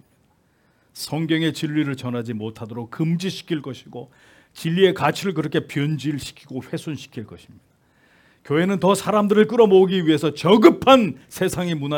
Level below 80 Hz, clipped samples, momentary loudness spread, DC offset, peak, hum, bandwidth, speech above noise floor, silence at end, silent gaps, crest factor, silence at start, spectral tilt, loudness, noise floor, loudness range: -58 dBFS; under 0.1%; 19 LU; under 0.1%; 0 dBFS; none; 18 kHz; 42 dB; 0 s; none; 20 dB; 0.95 s; -6 dB/octave; -20 LUFS; -61 dBFS; 11 LU